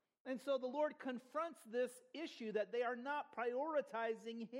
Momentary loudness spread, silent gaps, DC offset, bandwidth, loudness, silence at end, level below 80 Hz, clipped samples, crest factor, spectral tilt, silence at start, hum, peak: 7 LU; none; under 0.1%; 16 kHz; -43 LUFS; 0 s; under -90 dBFS; under 0.1%; 14 dB; -4.5 dB/octave; 0.25 s; none; -28 dBFS